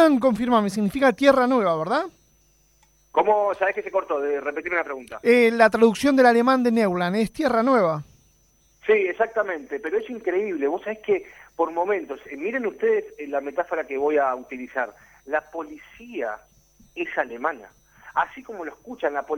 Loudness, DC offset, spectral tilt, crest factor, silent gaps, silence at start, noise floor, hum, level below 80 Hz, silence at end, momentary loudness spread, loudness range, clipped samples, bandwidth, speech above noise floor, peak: -23 LUFS; under 0.1%; -5.5 dB/octave; 20 dB; none; 0 s; -61 dBFS; none; -60 dBFS; 0 s; 15 LU; 11 LU; under 0.1%; 15.5 kHz; 39 dB; -4 dBFS